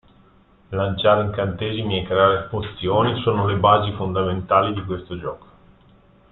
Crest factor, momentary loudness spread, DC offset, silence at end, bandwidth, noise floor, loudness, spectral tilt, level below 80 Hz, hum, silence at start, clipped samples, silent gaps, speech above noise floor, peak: 20 dB; 12 LU; under 0.1%; 0.95 s; 4.2 kHz; -53 dBFS; -20 LUFS; -11 dB/octave; -48 dBFS; none; 0.7 s; under 0.1%; none; 33 dB; -2 dBFS